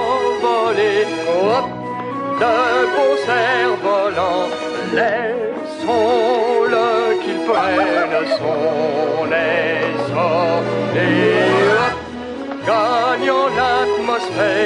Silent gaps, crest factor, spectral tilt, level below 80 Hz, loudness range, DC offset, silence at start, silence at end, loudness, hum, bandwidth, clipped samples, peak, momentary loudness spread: none; 14 dB; -5 dB/octave; -54 dBFS; 1 LU; under 0.1%; 0 s; 0 s; -17 LUFS; none; 10.5 kHz; under 0.1%; -4 dBFS; 7 LU